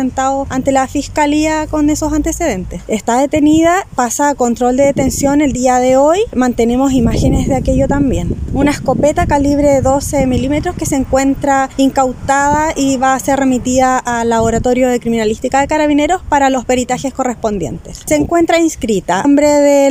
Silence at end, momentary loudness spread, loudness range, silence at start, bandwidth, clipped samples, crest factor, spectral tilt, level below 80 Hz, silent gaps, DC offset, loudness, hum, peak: 0 s; 6 LU; 2 LU; 0 s; 16 kHz; under 0.1%; 12 dB; -5 dB/octave; -28 dBFS; none; under 0.1%; -13 LUFS; none; 0 dBFS